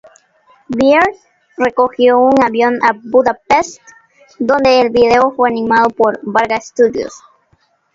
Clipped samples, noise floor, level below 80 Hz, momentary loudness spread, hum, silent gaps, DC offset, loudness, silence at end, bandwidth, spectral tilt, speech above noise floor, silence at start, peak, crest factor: under 0.1%; -57 dBFS; -48 dBFS; 7 LU; none; none; under 0.1%; -12 LUFS; 0.8 s; 7.6 kHz; -4.5 dB/octave; 45 dB; 0.7 s; 0 dBFS; 14 dB